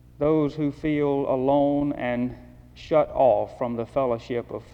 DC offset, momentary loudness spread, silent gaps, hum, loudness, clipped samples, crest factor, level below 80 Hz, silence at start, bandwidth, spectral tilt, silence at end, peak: under 0.1%; 8 LU; none; none; -24 LUFS; under 0.1%; 16 dB; -50 dBFS; 0.2 s; 7.2 kHz; -8.5 dB/octave; 0.1 s; -8 dBFS